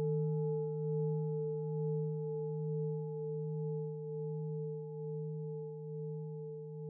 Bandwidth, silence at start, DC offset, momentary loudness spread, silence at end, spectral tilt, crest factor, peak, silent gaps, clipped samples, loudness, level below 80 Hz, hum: 1.4 kHz; 0 s; under 0.1%; 8 LU; 0 s; -8.5 dB/octave; 10 dB; -28 dBFS; none; under 0.1%; -39 LUFS; under -90 dBFS; none